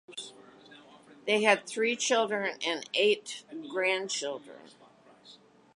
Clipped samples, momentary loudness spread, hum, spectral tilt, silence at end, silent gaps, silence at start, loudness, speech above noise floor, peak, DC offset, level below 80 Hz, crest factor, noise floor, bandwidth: under 0.1%; 16 LU; none; -2 dB/octave; 0.4 s; none; 0.1 s; -29 LUFS; 28 dB; -8 dBFS; under 0.1%; -86 dBFS; 24 dB; -58 dBFS; 11.5 kHz